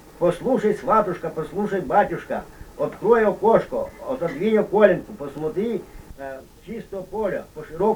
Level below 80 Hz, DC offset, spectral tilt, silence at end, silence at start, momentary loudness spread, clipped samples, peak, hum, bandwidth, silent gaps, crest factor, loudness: -48 dBFS; under 0.1%; -7 dB/octave; 0 s; 0.05 s; 18 LU; under 0.1%; 0 dBFS; none; over 20 kHz; none; 22 dB; -22 LUFS